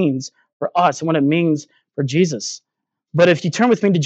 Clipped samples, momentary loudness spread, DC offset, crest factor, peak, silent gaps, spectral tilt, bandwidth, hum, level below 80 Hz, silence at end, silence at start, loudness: under 0.1%; 13 LU; under 0.1%; 16 dB; 0 dBFS; 0.53-0.60 s; -6 dB/octave; 8.2 kHz; none; -68 dBFS; 0 s; 0 s; -18 LUFS